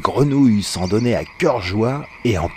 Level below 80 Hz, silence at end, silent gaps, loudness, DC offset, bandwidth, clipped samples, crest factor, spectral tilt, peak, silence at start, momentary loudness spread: -40 dBFS; 0 s; none; -18 LUFS; under 0.1%; 15.5 kHz; under 0.1%; 16 dB; -6 dB/octave; 0 dBFS; 0 s; 7 LU